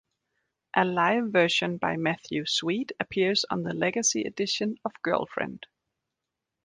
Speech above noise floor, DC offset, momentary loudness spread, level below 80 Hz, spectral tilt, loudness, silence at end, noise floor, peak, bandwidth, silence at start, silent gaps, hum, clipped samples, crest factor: 59 dB; under 0.1%; 8 LU; -66 dBFS; -3.5 dB/octave; -27 LUFS; 1.1 s; -86 dBFS; -6 dBFS; 10.5 kHz; 0.75 s; none; none; under 0.1%; 22 dB